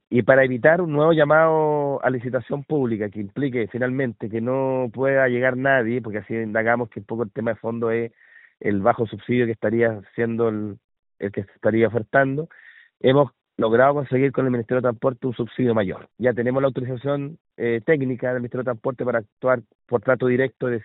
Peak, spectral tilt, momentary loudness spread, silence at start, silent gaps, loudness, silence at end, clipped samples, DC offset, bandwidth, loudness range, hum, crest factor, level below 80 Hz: 0 dBFS; -6 dB/octave; 10 LU; 0.1 s; 10.84-10.89 s, 10.99-11.03 s, 17.41-17.45 s, 19.32-19.37 s, 19.75-19.79 s; -22 LUFS; 0 s; under 0.1%; under 0.1%; 4.1 kHz; 4 LU; none; 20 dB; -62 dBFS